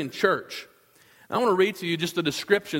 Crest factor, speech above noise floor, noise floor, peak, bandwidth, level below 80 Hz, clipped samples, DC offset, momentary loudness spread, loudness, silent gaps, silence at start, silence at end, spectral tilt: 20 dB; 33 dB; -58 dBFS; -6 dBFS; 16.5 kHz; -68 dBFS; under 0.1%; under 0.1%; 10 LU; -25 LUFS; none; 0 s; 0 s; -4.5 dB/octave